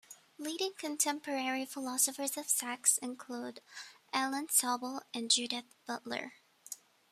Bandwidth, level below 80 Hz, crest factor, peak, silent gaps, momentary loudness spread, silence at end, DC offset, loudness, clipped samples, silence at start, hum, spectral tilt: 15.5 kHz; -88 dBFS; 24 dB; -12 dBFS; none; 18 LU; 0.35 s; under 0.1%; -33 LUFS; under 0.1%; 0.1 s; none; 0 dB/octave